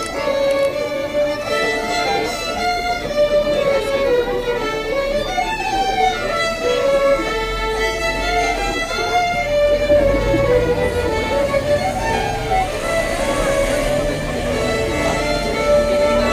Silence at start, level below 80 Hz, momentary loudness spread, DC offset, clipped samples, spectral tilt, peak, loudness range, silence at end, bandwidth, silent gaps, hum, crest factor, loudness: 0 s; -30 dBFS; 5 LU; under 0.1%; under 0.1%; -4 dB/octave; -4 dBFS; 2 LU; 0 s; 15.5 kHz; none; none; 14 dB; -18 LUFS